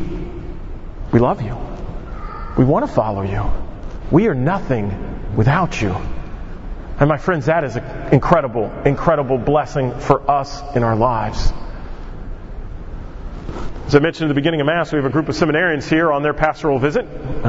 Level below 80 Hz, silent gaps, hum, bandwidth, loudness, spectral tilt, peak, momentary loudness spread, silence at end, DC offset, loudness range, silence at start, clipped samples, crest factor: -28 dBFS; none; none; 8 kHz; -18 LUFS; -7.5 dB/octave; 0 dBFS; 18 LU; 0 s; under 0.1%; 4 LU; 0 s; under 0.1%; 18 dB